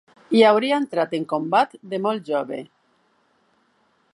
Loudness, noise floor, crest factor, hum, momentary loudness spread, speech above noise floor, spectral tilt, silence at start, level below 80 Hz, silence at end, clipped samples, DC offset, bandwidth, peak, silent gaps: -21 LUFS; -64 dBFS; 20 dB; none; 10 LU; 44 dB; -5.5 dB/octave; 0.3 s; -78 dBFS; 1.5 s; under 0.1%; under 0.1%; 11.5 kHz; -2 dBFS; none